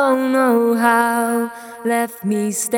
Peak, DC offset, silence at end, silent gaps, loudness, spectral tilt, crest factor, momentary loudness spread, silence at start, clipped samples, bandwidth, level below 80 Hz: 0 dBFS; under 0.1%; 0 s; none; -17 LUFS; -4.5 dB/octave; 16 dB; 7 LU; 0 s; under 0.1%; 18.5 kHz; -76 dBFS